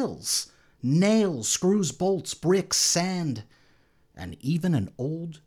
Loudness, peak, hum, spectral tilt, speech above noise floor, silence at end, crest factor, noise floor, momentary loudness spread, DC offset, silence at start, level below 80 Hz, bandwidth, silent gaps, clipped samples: -25 LUFS; -10 dBFS; none; -4.5 dB/octave; 36 dB; 0.1 s; 16 dB; -61 dBFS; 13 LU; under 0.1%; 0 s; -60 dBFS; 19.5 kHz; none; under 0.1%